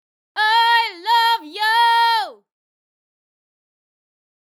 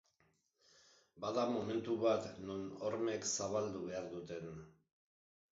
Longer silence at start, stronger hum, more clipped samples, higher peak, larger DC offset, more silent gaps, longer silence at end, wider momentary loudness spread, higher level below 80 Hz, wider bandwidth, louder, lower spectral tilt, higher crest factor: second, 0.35 s vs 1.15 s; neither; neither; first, -4 dBFS vs -22 dBFS; neither; neither; first, 2.25 s vs 0.85 s; second, 7 LU vs 11 LU; second, -84 dBFS vs -74 dBFS; first, 17 kHz vs 7.6 kHz; first, -16 LUFS vs -40 LUFS; second, 3 dB/octave vs -5 dB/octave; about the same, 16 dB vs 20 dB